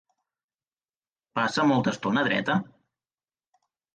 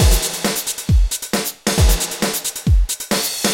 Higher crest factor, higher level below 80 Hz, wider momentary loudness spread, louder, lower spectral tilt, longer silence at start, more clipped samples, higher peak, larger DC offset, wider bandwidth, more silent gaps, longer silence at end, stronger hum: about the same, 18 dB vs 14 dB; second, -68 dBFS vs -20 dBFS; about the same, 6 LU vs 4 LU; second, -25 LUFS vs -18 LUFS; first, -5.5 dB/octave vs -3.5 dB/octave; first, 1.35 s vs 0 s; neither; second, -10 dBFS vs -2 dBFS; neither; second, 9.4 kHz vs 17 kHz; neither; first, 1.3 s vs 0 s; neither